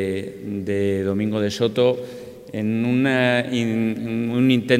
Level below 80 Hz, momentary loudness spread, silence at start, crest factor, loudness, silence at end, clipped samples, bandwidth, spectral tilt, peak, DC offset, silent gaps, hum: -62 dBFS; 11 LU; 0 s; 18 dB; -21 LUFS; 0 s; under 0.1%; 15 kHz; -6.5 dB/octave; -4 dBFS; under 0.1%; none; none